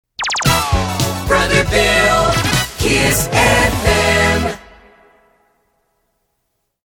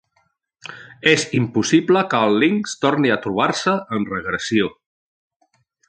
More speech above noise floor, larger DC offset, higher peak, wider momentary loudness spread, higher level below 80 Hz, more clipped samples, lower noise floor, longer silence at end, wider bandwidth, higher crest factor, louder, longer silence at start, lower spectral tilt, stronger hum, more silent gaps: first, 57 dB vs 47 dB; neither; about the same, 0 dBFS vs -2 dBFS; about the same, 7 LU vs 9 LU; first, -28 dBFS vs -58 dBFS; neither; first, -70 dBFS vs -66 dBFS; first, 2.25 s vs 1.15 s; first, over 20 kHz vs 9.2 kHz; about the same, 16 dB vs 18 dB; first, -14 LUFS vs -18 LUFS; second, 0.2 s vs 0.65 s; about the same, -3.5 dB/octave vs -4.5 dB/octave; neither; neither